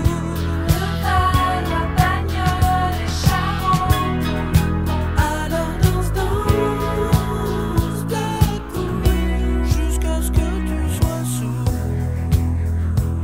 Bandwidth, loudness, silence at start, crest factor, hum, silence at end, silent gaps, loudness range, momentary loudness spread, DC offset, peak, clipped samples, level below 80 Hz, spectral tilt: 16.5 kHz; -20 LUFS; 0 s; 18 dB; none; 0 s; none; 2 LU; 4 LU; 0.7%; 0 dBFS; under 0.1%; -24 dBFS; -6 dB/octave